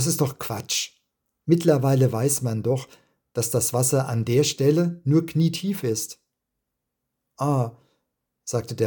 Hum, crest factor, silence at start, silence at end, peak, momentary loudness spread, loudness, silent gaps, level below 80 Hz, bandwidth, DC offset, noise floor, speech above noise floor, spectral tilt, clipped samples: none; 20 dB; 0 s; 0 s; -4 dBFS; 10 LU; -23 LUFS; none; -62 dBFS; 19 kHz; under 0.1%; -81 dBFS; 59 dB; -5.5 dB/octave; under 0.1%